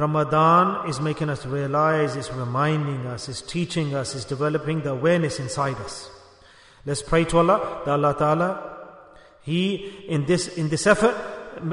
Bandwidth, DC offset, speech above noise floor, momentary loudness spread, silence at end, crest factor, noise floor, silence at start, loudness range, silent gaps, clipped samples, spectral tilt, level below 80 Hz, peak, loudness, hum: 11 kHz; under 0.1%; 29 dB; 13 LU; 0 s; 20 dB; -51 dBFS; 0 s; 3 LU; none; under 0.1%; -5.5 dB/octave; -48 dBFS; -4 dBFS; -23 LUFS; none